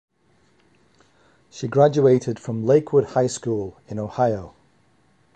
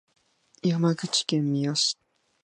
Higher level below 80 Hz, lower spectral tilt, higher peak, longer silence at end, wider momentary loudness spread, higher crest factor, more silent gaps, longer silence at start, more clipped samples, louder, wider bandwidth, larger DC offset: first, -56 dBFS vs -78 dBFS; first, -7 dB/octave vs -4.5 dB/octave; first, -4 dBFS vs -8 dBFS; first, 0.85 s vs 0.5 s; first, 14 LU vs 5 LU; about the same, 20 dB vs 18 dB; neither; first, 1.55 s vs 0.65 s; neither; first, -21 LUFS vs -25 LUFS; second, 9 kHz vs 10.5 kHz; neither